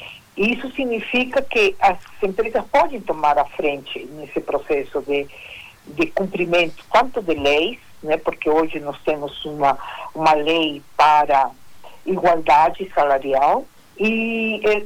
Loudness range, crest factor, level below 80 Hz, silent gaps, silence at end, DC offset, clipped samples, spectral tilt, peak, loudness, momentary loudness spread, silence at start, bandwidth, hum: 4 LU; 16 dB; -48 dBFS; none; 0 s; under 0.1%; under 0.1%; -5 dB/octave; -4 dBFS; -19 LUFS; 13 LU; 0 s; 19 kHz; none